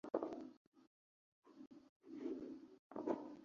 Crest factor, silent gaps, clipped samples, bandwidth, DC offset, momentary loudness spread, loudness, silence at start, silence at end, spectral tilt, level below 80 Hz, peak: 26 dB; 0.57-0.72 s, 0.87-1.42 s, 1.89-2.00 s, 2.79-2.90 s; under 0.1%; 7.2 kHz; under 0.1%; 18 LU; -49 LUFS; 0.05 s; 0 s; -6 dB/octave; -88 dBFS; -24 dBFS